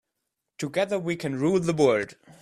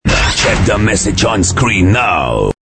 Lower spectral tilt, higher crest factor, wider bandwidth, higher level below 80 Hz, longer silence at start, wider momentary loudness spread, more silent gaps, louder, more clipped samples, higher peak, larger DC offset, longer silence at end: first, -6 dB/octave vs -4 dB/octave; first, 18 dB vs 12 dB; first, 14 kHz vs 8.8 kHz; second, -64 dBFS vs -22 dBFS; first, 0.6 s vs 0.05 s; first, 10 LU vs 2 LU; neither; second, -25 LUFS vs -11 LUFS; neither; second, -8 dBFS vs 0 dBFS; neither; about the same, 0.1 s vs 0.15 s